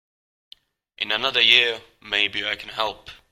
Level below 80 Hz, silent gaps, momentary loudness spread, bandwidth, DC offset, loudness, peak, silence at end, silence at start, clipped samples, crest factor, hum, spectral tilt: -60 dBFS; none; 15 LU; 16.5 kHz; under 0.1%; -20 LUFS; 0 dBFS; 0.15 s; 1 s; under 0.1%; 24 dB; none; -1.5 dB/octave